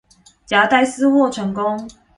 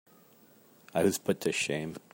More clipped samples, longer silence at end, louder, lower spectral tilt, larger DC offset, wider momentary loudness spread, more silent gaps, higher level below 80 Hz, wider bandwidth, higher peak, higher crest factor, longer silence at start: neither; about the same, 0.25 s vs 0.15 s; first, -17 LUFS vs -31 LUFS; about the same, -4.5 dB/octave vs -4 dB/octave; neither; about the same, 8 LU vs 7 LU; neither; first, -56 dBFS vs -72 dBFS; second, 11 kHz vs 16.5 kHz; first, 0 dBFS vs -14 dBFS; about the same, 18 dB vs 20 dB; second, 0.5 s vs 0.95 s